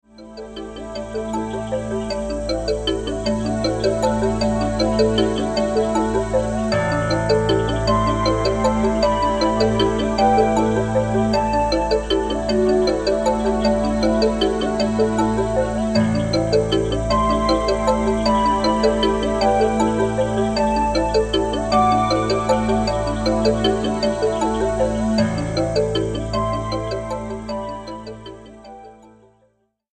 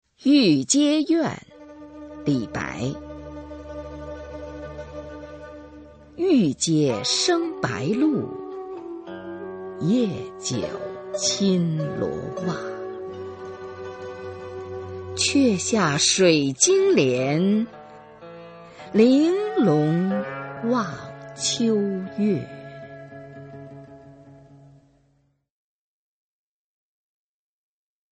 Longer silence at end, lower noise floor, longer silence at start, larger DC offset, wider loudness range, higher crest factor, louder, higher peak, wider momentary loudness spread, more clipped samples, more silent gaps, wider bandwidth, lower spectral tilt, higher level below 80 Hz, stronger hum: second, 1 s vs 3.55 s; about the same, -63 dBFS vs -66 dBFS; about the same, 0.2 s vs 0.2 s; neither; second, 5 LU vs 12 LU; about the same, 16 dB vs 20 dB; first, -19 LUFS vs -22 LUFS; about the same, -4 dBFS vs -4 dBFS; second, 8 LU vs 23 LU; neither; neither; first, 11 kHz vs 8.8 kHz; about the same, -5.5 dB/octave vs -4.5 dB/octave; first, -32 dBFS vs -54 dBFS; neither